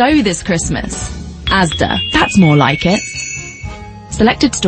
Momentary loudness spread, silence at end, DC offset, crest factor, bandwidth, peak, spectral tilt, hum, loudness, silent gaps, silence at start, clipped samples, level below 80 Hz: 17 LU; 0 s; under 0.1%; 14 dB; 8.8 kHz; 0 dBFS; -4.5 dB/octave; none; -13 LUFS; none; 0 s; under 0.1%; -30 dBFS